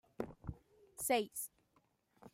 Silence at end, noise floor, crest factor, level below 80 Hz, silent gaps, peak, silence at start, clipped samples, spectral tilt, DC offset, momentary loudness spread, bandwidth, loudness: 0.05 s; -77 dBFS; 22 dB; -64 dBFS; none; -22 dBFS; 0.2 s; under 0.1%; -3 dB/octave; under 0.1%; 20 LU; 16 kHz; -40 LUFS